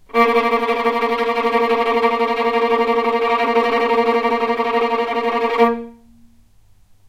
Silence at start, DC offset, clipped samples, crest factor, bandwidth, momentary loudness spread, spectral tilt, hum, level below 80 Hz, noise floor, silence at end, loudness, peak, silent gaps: 0.15 s; under 0.1%; under 0.1%; 16 dB; 14.5 kHz; 3 LU; -4.5 dB/octave; none; -54 dBFS; -50 dBFS; 1.15 s; -17 LUFS; -2 dBFS; none